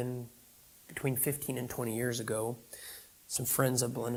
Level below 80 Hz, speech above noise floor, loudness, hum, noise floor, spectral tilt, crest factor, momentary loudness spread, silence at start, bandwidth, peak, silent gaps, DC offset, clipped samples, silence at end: -66 dBFS; 25 dB; -33 LUFS; none; -59 dBFS; -4.5 dB/octave; 22 dB; 16 LU; 0 s; 19 kHz; -14 dBFS; none; under 0.1%; under 0.1%; 0 s